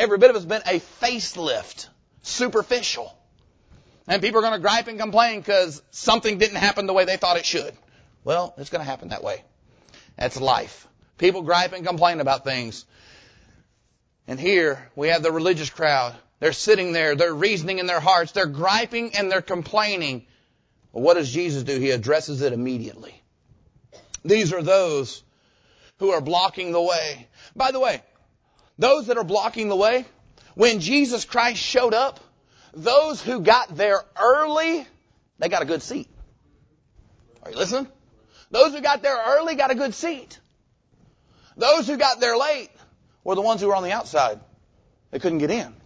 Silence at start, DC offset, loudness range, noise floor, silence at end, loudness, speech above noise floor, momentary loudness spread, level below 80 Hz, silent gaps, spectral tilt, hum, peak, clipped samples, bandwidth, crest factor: 0 s; under 0.1%; 5 LU; -67 dBFS; 0.15 s; -21 LUFS; 45 dB; 12 LU; -58 dBFS; none; -3.5 dB/octave; none; -2 dBFS; under 0.1%; 8 kHz; 22 dB